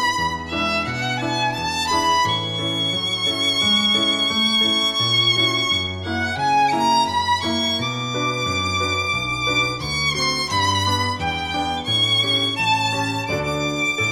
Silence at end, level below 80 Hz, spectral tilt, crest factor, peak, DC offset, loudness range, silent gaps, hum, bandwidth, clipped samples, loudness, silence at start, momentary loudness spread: 0 s; -46 dBFS; -3 dB/octave; 14 dB; -6 dBFS; under 0.1%; 3 LU; none; none; 19 kHz; under 0.1%; -19 LUFS; 0 s; 7 LU